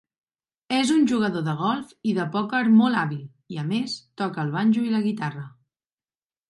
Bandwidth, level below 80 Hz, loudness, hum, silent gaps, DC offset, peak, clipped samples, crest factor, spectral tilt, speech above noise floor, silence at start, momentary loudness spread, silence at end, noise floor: 11.5 kHz; -70 dBFS; -23 LUFS; none; none; under 0.1%; -8 dBFS; under 0.1%; 16 dB; -6 dB/octave; over 67 dB; 0.7 s; 13 LU; 1 s; under -90 dBFS